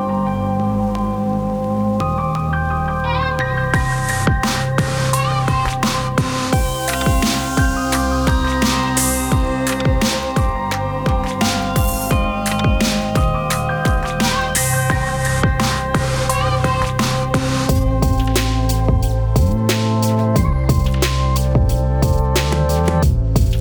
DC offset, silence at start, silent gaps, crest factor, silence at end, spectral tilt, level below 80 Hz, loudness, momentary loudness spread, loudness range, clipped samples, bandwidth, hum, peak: under 0.1%; 0 s; none; 14 dB; 0 s; -5 dB/octave; -22 dBFS; -18 LUFS; 3 LU; 2 LU; under 0.1%; over 20 kHz; none; -2 dBFS